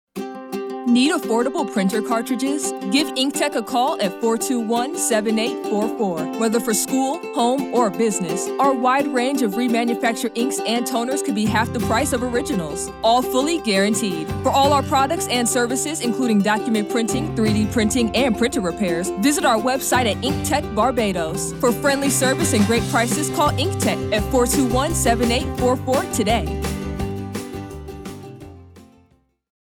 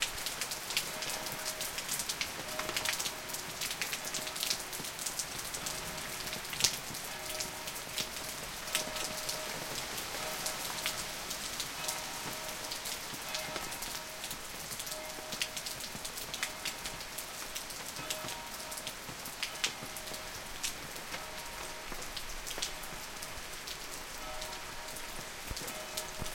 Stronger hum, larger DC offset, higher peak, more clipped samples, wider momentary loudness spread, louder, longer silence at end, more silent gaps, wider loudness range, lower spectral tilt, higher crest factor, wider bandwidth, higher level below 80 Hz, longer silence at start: neither; neither; first, -4 dBFS vs -8 dBFS; neither; about the same, 7 LU vs 7 LU; first, -20 LUFS vs -37 LUFS; first, 0.85 s vs 0 s; neither; second, 2 LU vs 5 LU; first, -4 dB/octave vs -0.5 dB/octave; second, 16 dB vs 32 dB; first, 19 kHz vs 17 kHz; first, -40 dBFS vs -56 dBFS; first, 0.15 s vs 0 s